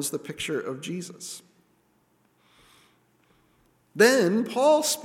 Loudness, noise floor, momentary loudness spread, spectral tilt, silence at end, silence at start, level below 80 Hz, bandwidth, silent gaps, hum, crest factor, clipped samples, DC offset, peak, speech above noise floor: -24 LUFS; -66 dBFS; 19 LU; -3.5 dB/octave; 0 s; 0 s; -72 dBFS; 17.5 kHz; none; none; 22 dB; under 0.1%; under 0.1%; -4 dBFS; 42 dB